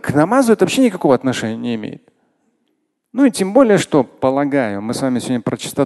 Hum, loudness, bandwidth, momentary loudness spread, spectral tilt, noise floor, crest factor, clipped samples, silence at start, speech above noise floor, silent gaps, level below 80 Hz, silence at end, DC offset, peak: none; -16 LUFS; 12.5 kHz; 10 LU; -5.5 dB/octave; -68 dBFS; 16 dB; under 0.1%; 0.05 s; 53 dB; none; -54 dBFS; 0 s; under 0.1%; 0 dBFS